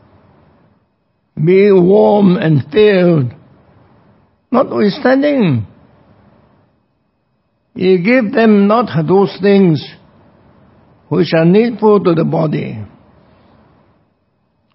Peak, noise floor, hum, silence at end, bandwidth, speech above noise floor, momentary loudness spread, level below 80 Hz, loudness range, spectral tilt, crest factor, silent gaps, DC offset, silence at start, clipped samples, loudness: 0 dBFS; -62 dBFS; none; 1.9 s; 5.8 kHz; 52 dB; 11 LU; -52 dBFS; 5 LU; -11.5 dB/octave; 14 dB; none; under 0.1%; 1.35 s; under 0.1%; -11 LUFS